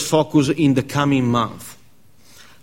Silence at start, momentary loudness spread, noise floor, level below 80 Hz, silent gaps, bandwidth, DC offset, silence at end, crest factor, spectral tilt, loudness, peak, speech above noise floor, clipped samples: 0 s; 14 LU; -54 dBFS; -50 dBFS; none; 16.5 kHz; 0.4%; 0.9 s; 18 dB; -6 dB/octave; -18 LUFS; -2 dBFS; 37 dB; under 0.1%